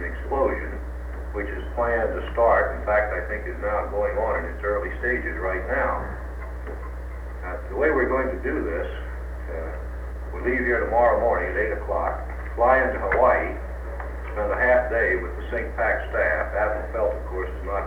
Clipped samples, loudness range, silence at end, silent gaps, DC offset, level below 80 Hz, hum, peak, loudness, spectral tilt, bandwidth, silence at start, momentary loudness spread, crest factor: under 0.1%; 5 LU; 0 s; none; under 0.1%; -32 dBFS; 60 Hz at -35 dBFS; -6 dBFS; -25 LUFS; -8 dB/octave; 5.4 kHz; 0 s; 15 LU; 18 dB